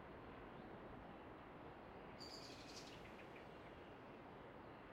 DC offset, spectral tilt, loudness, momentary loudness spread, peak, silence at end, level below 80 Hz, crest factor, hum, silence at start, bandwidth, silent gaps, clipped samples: under 0.1%; -4.5 dB/octave; -57 LUFS; 4 LU; -42 dBFS; 0 s; -72 dBFS; 16 dB; none; 0 s; 15.5 kHz; none; under 0.1%